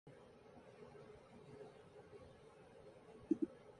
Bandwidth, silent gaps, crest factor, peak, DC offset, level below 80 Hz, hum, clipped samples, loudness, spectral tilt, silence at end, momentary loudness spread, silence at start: 10.5 kHz; none; 26 dB; -24 dBFS; under 0.1%; -78 dBFS; none; under 0.1%; -50 LUFS; -7.5 dB/octave; 0 s; 20 LU; 0.05 s